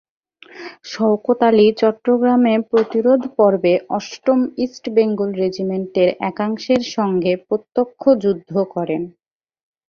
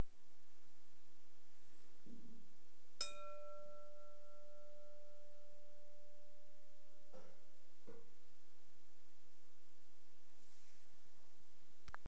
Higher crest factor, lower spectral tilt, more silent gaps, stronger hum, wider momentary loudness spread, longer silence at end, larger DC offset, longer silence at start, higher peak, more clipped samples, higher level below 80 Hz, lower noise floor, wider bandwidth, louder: second, 16 dB vs 26 dB; first, -6.5 dB/octave vs -3.5 dB/octave; neither; neither; second, 9 LU vs 20 LU; first, 0.8 s vs 0.15 s; second, under 0.1% vs 1%; first, 0.55 s vs 0 s; first, -2 dBFS vs -26 dBFS; neither; first, -60 dBFS vs -80 dBFS; second, -37 dBFS vs -75 dBFS; second, 7 kHz vs 8 kHz; first, -17 LUFS vs -57 LUFS